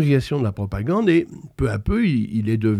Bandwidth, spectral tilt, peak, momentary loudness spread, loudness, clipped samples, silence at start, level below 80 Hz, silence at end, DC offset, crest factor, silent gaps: 13.5 kHz; -8 dB/octave; -6 dBFS; 7 LU; -21 LUFS; under 0.1%; 0 s; -38 dBFS; 0 s; under 0.1%; 14 dB; none